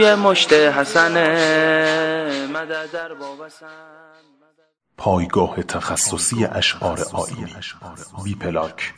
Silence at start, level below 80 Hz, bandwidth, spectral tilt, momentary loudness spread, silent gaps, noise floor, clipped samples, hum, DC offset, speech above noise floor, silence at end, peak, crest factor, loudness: 0 s; -50 dBFS; 11 kHz; -3 dB/octave; 19 LU; none; -63 dBFS; under 0.1%; none; under 0.1%; 44 dB; 0.05 s; -2 dBFS; 18 dB; -18 LUFS